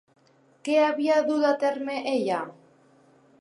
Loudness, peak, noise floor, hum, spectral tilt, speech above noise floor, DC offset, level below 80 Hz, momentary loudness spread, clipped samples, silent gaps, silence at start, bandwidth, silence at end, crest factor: -25 LUFS; -10 dBFS; -58 dBFS; none; -4.5 dB/octave; 35 dB; under 0.1%; -84 dBFS; 9 LU; under 0.1%; none; 0.65 s; 11 kHz; 0.9 s; 16 dB